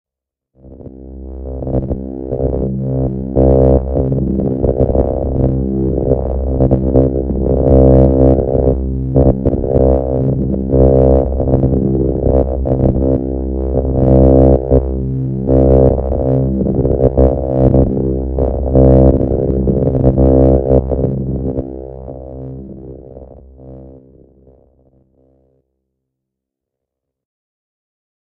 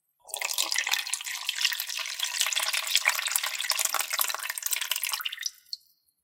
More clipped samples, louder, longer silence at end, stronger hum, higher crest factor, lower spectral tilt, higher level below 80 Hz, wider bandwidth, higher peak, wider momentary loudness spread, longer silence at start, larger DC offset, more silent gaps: neither; first, -13 LUFS vs -27 LUFS; first, 4.25 s vs 0.5 s; neither; second, 14 dB vs 28 dB; first, -14 dB/octave vs 6 dB/octave; first, -20 dBFS vs -86 dBFS; second, 2.1 kHz vs 17 kHz; first, 0 dBFS vs -4 dBFS; first, 13 LU vs 9 LU; first, 0.65 s vs 0.25 s; neither; neither